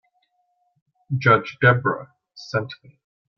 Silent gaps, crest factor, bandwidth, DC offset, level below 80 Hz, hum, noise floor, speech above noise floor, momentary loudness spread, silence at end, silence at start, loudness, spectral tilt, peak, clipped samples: none; 22 dB; 6.6 kHz; under 0.1%; -60 dBFS; none; -69 dBFS; 49 dB; 20 LU; 0.65 s; 1.1 s; -20 LUFS; -7 dB/octave; -2 dBFS; under 0.1%